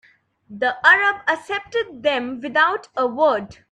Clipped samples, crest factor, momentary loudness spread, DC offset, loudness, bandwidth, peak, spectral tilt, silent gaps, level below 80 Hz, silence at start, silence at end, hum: under 0.1%; 20 dB; 11 LU; under 0.1%; -19 LUFS; 11 kHz; 0 dBFS; -3.5 dB/octave; none; -62 dBFS; 0.5 s; 0.2 s; none